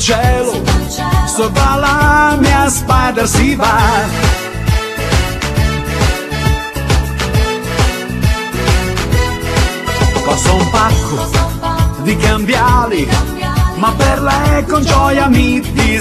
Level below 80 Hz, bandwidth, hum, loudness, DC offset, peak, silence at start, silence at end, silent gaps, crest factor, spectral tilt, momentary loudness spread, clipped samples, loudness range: -18 dBFS; 14.5 kHz; none; -13 LUFS; under 0.1%; 0 dBFS; 0 s; 0 s; none; 12 dB; -5 dB/octave; 5 LU; under 0.1%; 4 LU